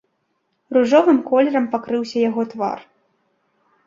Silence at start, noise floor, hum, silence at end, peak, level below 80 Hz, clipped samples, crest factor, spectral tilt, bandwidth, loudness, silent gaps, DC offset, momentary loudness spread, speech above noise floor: 0.7 s; -70 dBFS; none; 1.05 s; -2 dBFS; -68 dBFS; under 0.1%; 18 dB; -6 dB/octave; 7.6 kHz; -18 LUFS; none; under 0.1%; 11 LU; 53 dB